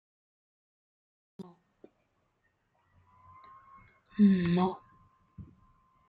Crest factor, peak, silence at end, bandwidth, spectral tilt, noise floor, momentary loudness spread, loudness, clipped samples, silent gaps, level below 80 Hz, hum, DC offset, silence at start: 20 dB; -14 dBFS; 0.65 s; 4.8 kHz; -10.5 dB/octave; -76 dBFS; 28 LU; -27 LUFS; under 0.1%; none; -66 dBFS; none; under 0.1%; 1.4 s